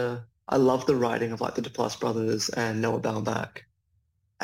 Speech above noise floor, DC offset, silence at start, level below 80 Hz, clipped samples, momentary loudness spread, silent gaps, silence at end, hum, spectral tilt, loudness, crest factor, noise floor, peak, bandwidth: 45 dB; under 0.1%; 0 s; -64 dBFS; under 0.1%; 9 LU; none; 0 s; none; -5 dB/octave; -27 LUFS; 18 dB; -72 dBFS; -10 dBFS; 16.5 kHz